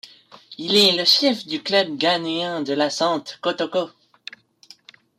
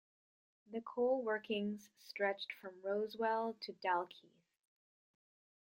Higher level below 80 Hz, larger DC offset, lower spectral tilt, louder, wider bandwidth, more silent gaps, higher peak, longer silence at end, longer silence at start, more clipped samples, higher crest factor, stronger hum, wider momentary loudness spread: first, -72 dBFS vs -88 dBFS; neither; second, -3 dB/octave vs -5.5 dB/octave; first, -19 LUFS vs -40 LUFS; about the same, 16 kHz vs 16 kHz; neither; first, -4 dBFS vs -24 dBFS; second, 1.3 s vs 1.55 s; second, 0.05 s vs 0.7 s; neither; about the same, 18 dB vs 18 dB; neither; first, 19 LU vs 12 LU